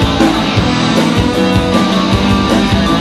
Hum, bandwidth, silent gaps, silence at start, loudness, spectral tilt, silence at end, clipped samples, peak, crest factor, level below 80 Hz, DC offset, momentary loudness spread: none; 13.5 kHz; none; 0 s; -11 LUFS; -5.5 dB/octave; 0 s; under 0.1%; 0 dBFS; 10 dB; -24 dBFS; under 0.1%; 1 LU